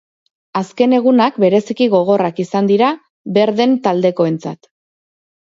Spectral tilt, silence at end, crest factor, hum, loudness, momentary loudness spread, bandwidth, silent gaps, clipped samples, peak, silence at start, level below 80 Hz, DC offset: -7 dB/octave; 0.95 s; 14 dB; none; -15 LUFS; 11 LU; 7.6 kHz; 3.10-3.24 s; under 0.1%; -2 dBFS; 0.55 s; -66 dBFS; under 0.1%